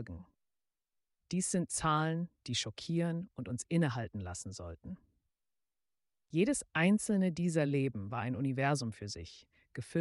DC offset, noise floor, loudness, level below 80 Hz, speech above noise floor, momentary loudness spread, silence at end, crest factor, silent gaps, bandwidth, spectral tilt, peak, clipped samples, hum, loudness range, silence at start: under 0.1%; under -90 dBFS; -34 LUFS; -64 dBFS; over 56 dB; 16 LU; 0 s; 18 dB; none; 11.5 kHz; -5 dB/octave; -18 dBFS; under 0.1%; none; 6 LU; 0 s